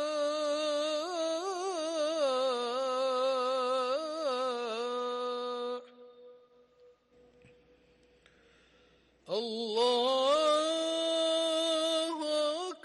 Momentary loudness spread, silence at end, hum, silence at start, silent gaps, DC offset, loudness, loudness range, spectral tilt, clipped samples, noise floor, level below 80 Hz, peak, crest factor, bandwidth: 8 LU; 0.05 s; none; 0 s; none; under 0.1%; -31 LUFS; 13 LU; -1.5 dB/octave; under 0.1%; -65 dBFS; -80 dBFS; -18 dBFS; 14 dB; 11.5 kHz